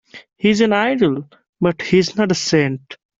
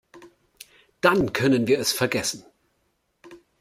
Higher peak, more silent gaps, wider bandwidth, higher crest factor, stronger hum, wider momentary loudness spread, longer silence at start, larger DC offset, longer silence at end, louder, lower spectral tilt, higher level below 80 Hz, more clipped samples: about the same, -2 dBFS vs -4 dBFS; first, 1.49-1.53 s vs none; second, 7.8 kHz vs 16 kHz; second, 14 dB vs 22 dB; neither; about the same, 7 LU vs 7 LU; about the same, 0.15 s vs 0.15 s; neither; about the same, 0.25 s vs 0.25 s; first, -17 LUFS vs -22 LUFS; about the same, -5 dB/octave vs -4 dB/octave; about the same, -54 dBFS vs -58 dBFS; neither